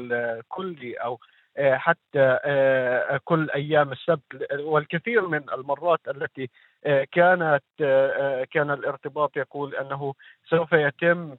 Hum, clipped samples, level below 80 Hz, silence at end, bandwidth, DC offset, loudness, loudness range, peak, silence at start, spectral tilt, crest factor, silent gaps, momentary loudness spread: none; under 0.1%; -74 dBFS; 0 s; 4.1 kHz; under 0.1%; -24 LUFS; 3 LU; -4 dBFS; 0 s; -9 dB/octave; 20 dB; none; 12 LU